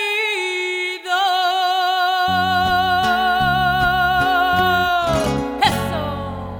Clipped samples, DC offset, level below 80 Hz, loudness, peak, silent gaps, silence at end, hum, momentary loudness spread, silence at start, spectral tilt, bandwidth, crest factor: under 0.1%; under 0.1%; -38 dBFS; -18 LUFS; -2 dBFS; none; 0 s; none; 5 LU; 0 s; -4 dB/octave; 19 kHz; 16 dB